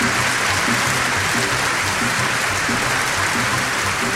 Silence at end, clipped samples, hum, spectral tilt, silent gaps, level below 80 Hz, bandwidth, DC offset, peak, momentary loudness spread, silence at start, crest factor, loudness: 0 s; under 0.1%; none; -2.5 dB/octave; none; -44 dBFS; 16.5 kHz; under 0.1%; -4 dBFS; 1 LU; 0 s; 14 dB; -18 LUFS